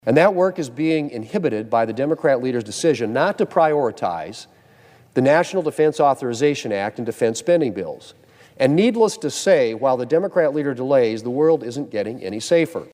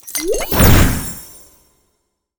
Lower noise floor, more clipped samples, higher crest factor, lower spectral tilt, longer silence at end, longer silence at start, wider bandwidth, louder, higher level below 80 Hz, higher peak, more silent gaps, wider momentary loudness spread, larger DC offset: second, -50 dBFS vs -69 dBFS; neither; about the same, 18 dB vs 16 dB; about the same, -5.5 dB/octave vs -4.5 dB/octave; second, 0.1 s vs 1.05 s; about the same, 0.05 s vs 0.05 s; second, 15.5 kHz vs over 20 kHz; second, -20 LUFS vs -14 LUFS; second, -66 dBFS vs -22 dBFS; about the same, -2 dBFS vs 0 dBFS; neither; second, 9 LU vs 19 LU; neither